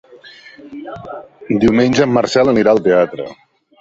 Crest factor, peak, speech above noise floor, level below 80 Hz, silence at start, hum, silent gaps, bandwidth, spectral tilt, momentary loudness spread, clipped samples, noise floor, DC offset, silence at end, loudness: 14 dB; 0 dBFS; 26 dB; -46 dBFS; 0.15 s; none; none; 8 kHz; -6 dB/octave; 20 LU; under 0.1%; -40 dBFS; under 0.1%; 0.45 s; -13 LUFS